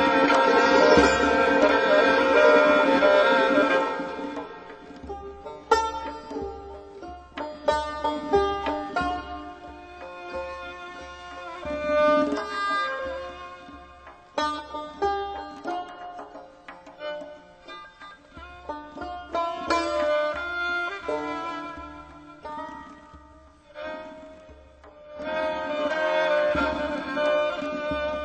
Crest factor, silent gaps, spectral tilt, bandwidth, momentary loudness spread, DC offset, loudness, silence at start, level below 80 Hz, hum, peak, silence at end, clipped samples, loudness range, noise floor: 20 dB; none; -4.5 dB/octave; 9 kHz; 24 LU; under 0.1%; -23 LUFS; 0 s; -50 dBFS; none; -4 dBFS; 0 s; under 0.1%; 17 LU; -51 dBFS